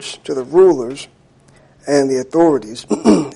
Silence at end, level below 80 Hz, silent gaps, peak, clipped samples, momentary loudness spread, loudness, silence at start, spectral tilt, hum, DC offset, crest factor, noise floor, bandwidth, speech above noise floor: 0 s; -54 dBFS; none; -2 dBFS; under 0.1%; 18 LU; -15 LUFS; 0 s; -5.5 dB/octave; none; under 0.1%; 14 dB; -49 dBFS; 11.5 kHz; 34 dB